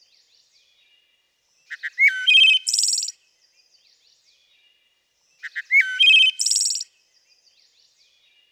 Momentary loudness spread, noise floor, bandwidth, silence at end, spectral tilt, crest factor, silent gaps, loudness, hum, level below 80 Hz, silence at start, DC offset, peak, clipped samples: 21 LU; -66 dBFS; 16 kHz; 1.7 s; 10 dB/octave; 16 dB; none; -15 LUFS; none; under -90 dBFS; 1.7 s; under 0.1%; -6 dBFS; under 0.1%